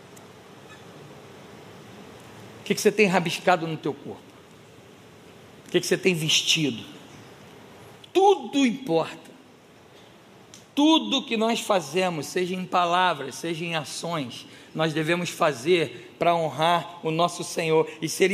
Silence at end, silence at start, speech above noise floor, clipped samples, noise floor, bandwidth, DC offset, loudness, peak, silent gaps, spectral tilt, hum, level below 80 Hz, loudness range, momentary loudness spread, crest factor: 0 s; 0.05 s; 28 dB; under 0.1%; -52 dBFS; 15.5 kHz; under 0.1%; -24 LUFS; -4 dBFS; none; -4 dB/octave; none; -74 dBFS; 3 LU; 25 LU; 22 dB